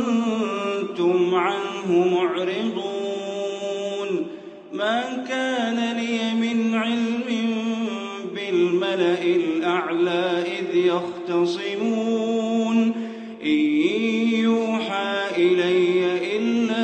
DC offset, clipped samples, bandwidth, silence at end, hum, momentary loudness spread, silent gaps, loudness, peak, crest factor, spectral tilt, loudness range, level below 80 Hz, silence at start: under 0.1%; under 0.1%; 8.6 kHz; 0 s; none; 8 LU; none; -23 LUFS; -8 dBFS; 14 dB; -5.5 dB/octave; 4 LU; -74 dBFS; 0 s